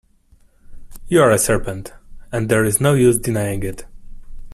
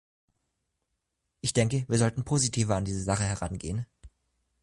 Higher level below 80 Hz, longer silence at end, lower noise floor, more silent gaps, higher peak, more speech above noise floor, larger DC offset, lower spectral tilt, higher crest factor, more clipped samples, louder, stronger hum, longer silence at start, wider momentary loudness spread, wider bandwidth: first, -36 dBFS vs -48 dBFS; second, 0 s vs 0.55 s; second, -53 dBFS vs -81 dBFS; neither; first, 0 dBFS vs -12 dBFS; second, 36 dB vs 54 dB; neither; about the same, -5 dB/octave vs -5 dB/octave; about the same, 18 dB vs 18 dB; neither; first, -17 LUFS vs -28 LUFS; neither; second, 0.7 s vs 1.45 s; first, 16 LU vs 9 LU; first, 15.5 kHz vs 11.5 kHz